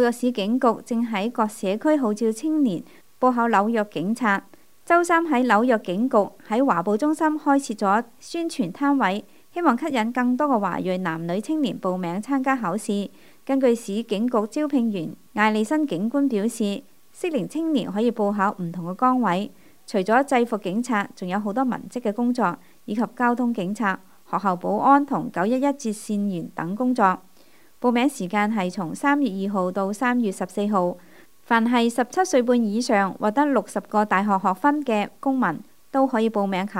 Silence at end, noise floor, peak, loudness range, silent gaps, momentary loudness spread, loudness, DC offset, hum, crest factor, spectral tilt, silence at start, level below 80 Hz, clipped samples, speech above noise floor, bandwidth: 0 s; -56 dBFS; -4 dBFS; 3 LU; none; 8 LU; -23 LUFS; 0.3%; none; 20 dB; -5.5 dB/octave; 0 s; -70 dBFS; under 0.1%; 34 dB; 16 kHz